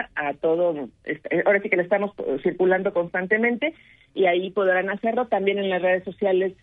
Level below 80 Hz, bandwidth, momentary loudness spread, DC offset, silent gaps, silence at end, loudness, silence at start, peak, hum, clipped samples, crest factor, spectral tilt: -64 dBFS; 3.9 kHz; 6 LU; under 0.1%; none; 0.1 s; -23 LUFS; 0 s; -6 dBFS; none; under 0.1%; 18 dB; -8.5 dB/octave